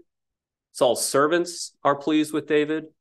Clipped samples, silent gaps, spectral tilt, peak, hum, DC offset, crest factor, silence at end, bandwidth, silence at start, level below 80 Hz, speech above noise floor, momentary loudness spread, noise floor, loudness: under 0.1%; none; -3.5 dB/octave; -6 dBFS; none; under 0.1%; 18 dB; 0.1 s; 12.5 kHz; 0.75 s; -76 dBFS; 63 dB; 7 LU; -86 dBFS; -23 LUFS